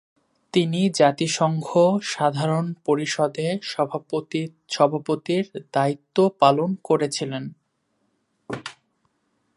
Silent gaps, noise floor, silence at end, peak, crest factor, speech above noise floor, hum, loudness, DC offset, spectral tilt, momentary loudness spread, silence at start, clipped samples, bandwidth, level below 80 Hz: none; -71 dBFS; 0.85 s; -2 dBFS; 22 dB; 49 dB; none; -22 LUFS; under 0.1%; -5.5 dB/octave; 12 LU; 0.55 s; under 0.1%; 11.5 kHz; -70 dBFS